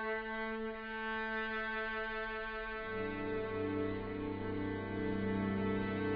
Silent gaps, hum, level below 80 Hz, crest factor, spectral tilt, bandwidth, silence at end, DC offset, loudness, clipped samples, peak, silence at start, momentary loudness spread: none; none; -56 dBFS; 14 dB; -4.5 dB/octave; 5.4 kHz; 0 s; under 0.1%; -39 LUFS; under 0.1%; -26 dBFS; 0 s; 5 LU